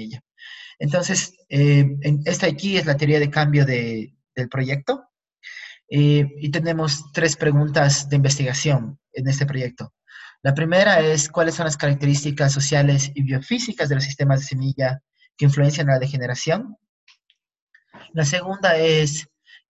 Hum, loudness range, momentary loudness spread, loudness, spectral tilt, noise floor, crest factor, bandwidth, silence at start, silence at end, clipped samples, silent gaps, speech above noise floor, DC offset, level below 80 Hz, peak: none; 4 LU; 13 LU; -20 LUFS; -5 dB/octave; -67 dBFS; 18 dB; 8.2 kHz; 0 s; 0.45 s; under 0.1%; 16.89-17.07 s, 17.62-17.67 s; 47 dB; under 0.1%; -56 dBFS; -4 dBFS